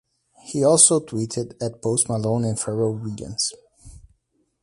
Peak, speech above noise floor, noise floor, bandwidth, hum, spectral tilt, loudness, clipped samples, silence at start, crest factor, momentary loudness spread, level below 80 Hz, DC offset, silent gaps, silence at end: 0 dBFS; 47 dB; -68 dBFS; 11.5 kHz; none; -4.5 dB/octave; -21 LUFS; under 0.1%; 0.45 s; 22 dB; 16 LU; -54 dBFS; under 0.1%; none; 0.65 s